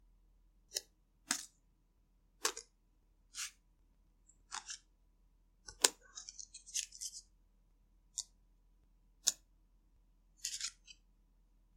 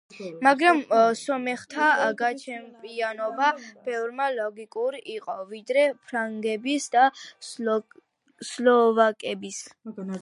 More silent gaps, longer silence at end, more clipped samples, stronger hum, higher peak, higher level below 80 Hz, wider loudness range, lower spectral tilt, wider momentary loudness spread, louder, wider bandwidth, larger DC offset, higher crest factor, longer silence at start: neither; first, 0.85 s vs 0 s; neither; neither; about the same, -4 dBFS vs -4 dBFS; first, -70 dBFS vs -82 dBFS; about the same, 7 LU vs 5 LU; second, 1.5 dB/octave vs -3.5 dB/octave; first, 21 LU vs 17 LU; second, -40 LUFS vs -24 LUFS; first, 16 kHz vs 11.5 kHz; neither; first, 42 dB vs 20 dB; first, 0.7 s vs 0.15 s